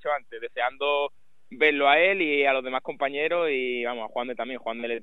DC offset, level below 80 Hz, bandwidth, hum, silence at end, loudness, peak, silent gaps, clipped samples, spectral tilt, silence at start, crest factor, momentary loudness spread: 0.4%; -72 dBFS; 4.2 kHz; none; 0 s; -25 LUFS; -6 dBFS; none; under 0.1%; -5.5 dB/octave; 0.05 s; 20 dB; 13 LU